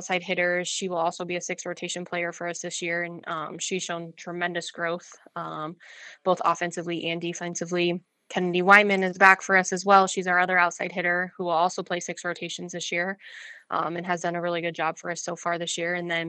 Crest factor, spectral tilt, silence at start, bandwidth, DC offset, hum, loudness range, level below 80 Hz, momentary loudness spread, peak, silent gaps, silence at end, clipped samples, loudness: 26 dB; -3.5 dB/octave; 0 s; 11 kHz; under 0.1%; none; 10 LU; -82 dBFS; 14 LU; 0 dBFS; none; 0 s; under 0.1%; -25 LUFS